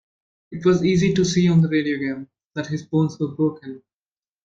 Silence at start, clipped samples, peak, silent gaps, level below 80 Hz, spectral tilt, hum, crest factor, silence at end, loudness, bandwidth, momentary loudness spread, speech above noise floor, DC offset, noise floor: 0.5 s; under 0.1%; -6 dBFS; 2.45-2.50 s; -54 dBFS; -6.5 dB/octave; none; 14 dB; 0.7 s; -20 LUFS; 7.8 kHz; 17 LU; over 70 dB; under 0.1%; under -90 dBFS